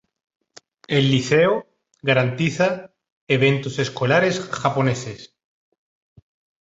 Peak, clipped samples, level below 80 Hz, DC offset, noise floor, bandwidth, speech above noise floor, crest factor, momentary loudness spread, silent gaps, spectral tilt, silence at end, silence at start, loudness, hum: -4 dBFS; under 0.1%; -58 dBFS; under 0.1%; -50 dBFS; 8 kHz; 31 dB; 18 dB; 10 LU; 3.12-3.27 s; -5.5 dB/octave; 1.4 s; 0.9 s; -20 LUFS; none